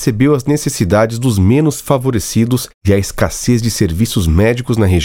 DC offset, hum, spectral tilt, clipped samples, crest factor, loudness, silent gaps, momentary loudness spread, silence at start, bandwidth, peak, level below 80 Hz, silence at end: under 0.1%; none; -6 dB/octave; under 0.1%; 12 dB; -14 LUFS; 2.74-2.81 s; 4 LU; 0 s; 17 kHz; 0 dBFS; -32 dBFS; 0 s